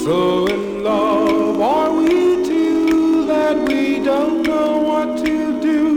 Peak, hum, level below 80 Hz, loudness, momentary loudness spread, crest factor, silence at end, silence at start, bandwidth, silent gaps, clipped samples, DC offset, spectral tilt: -4 dBFS; none; -46 dBFS; -16 LUFS; 4 LU; 10 dB; 0 s; 0 s; 15 kHz; none; under 0.1%; under 0.1%; -5.5 dB/octave